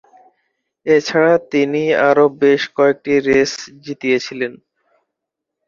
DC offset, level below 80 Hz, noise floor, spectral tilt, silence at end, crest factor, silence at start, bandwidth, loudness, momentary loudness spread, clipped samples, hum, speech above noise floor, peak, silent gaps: under 0.1%; -58 dBFS; -80 dBFS; -5 dB/octave; 1.15 s; 16 dB; 0.85 s; 7.4 kHz; -15 LUFS; 12 LU; under 0.1%; none; 65 dB; 0 dBFS; none